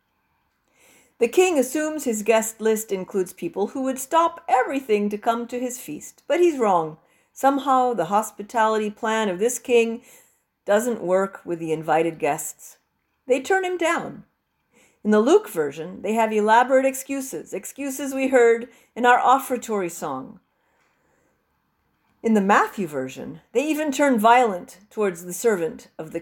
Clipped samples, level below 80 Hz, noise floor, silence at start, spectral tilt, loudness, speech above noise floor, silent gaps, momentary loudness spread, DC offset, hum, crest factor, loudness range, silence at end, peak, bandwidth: under 0.1%; -68 dBFS; -71 dBFS; 1.2 s; -4 dB/octave; -22 LUFS; 49 dB; none; 14 LU; under 0.1%; none; 20 dB; 4 LU; 0 s; -4 dBFS; 17 kHz